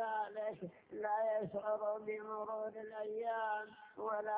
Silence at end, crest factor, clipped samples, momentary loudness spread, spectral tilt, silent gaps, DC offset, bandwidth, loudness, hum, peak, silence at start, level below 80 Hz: 0 s; 14 dB; under 0.1%; 8 LU; -4 dB/octave; none; under 0.1%; 4 kHz; -41 LUFS; none; -28 dBFS; 0 s; -84 dBFS